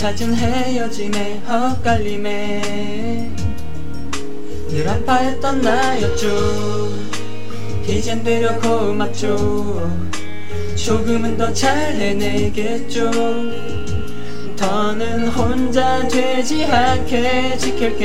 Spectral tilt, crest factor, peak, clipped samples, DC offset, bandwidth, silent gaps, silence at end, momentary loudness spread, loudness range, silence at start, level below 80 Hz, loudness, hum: -5 dB/octave; 16 dB; -2 dBFS; under 0.1%; 10%; 16 kHz; none; 0 s; 10 LU; 4 LU; 0 s; -34 dBFS; -19 LUFS; none